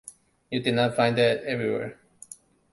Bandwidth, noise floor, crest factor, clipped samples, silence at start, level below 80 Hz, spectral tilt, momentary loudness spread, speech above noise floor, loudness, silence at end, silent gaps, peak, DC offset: 11.5 kHz; -49 dBFS; 20 dB; under 0.1%; 0.05 s; -64 dBFS; -5.5 dB/octave; 23 LU; 25 dB; -25 LUFS; 0.4 s; none; -8 dBFS; under 0.1%